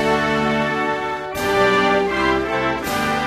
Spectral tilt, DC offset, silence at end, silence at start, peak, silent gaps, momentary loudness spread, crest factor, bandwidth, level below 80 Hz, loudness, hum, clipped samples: -4.5 dB/octave; under 0.1%; 0 s; 0 s; -4 dBFS; none; 6 LU; 14 dB; 15 kHz; -42 dBFS; -19 LUFS; none; under 0.1%